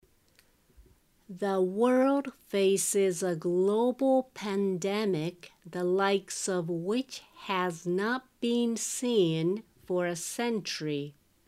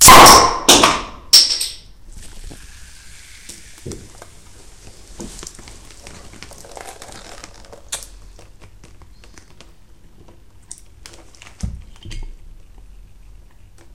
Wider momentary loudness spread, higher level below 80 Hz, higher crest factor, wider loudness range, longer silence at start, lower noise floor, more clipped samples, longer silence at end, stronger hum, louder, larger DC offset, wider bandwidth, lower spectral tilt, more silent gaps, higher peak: second, 8 LU vs 29 LU; second, -70 dBFS vs -36 dBFS; about the same, 18 dB vs 18 dB; second, 4 LU vs 23 LU; first, 0.8 s vs 0 s; first, -65 dBFS vs -46 dBFS; second, under 0.1% vs 0.4%; second, 0.35 s vs 1.65 s; neither; second, -29 LUFS vs -9 LUFS; second, under 0.1% vs 0.6%; about the same, 15.5 kHz vs 17 kHz; first, -4.5 dB/octave vs -1 dB/octave; neither; second, -12 dBFS vs 0 dBFS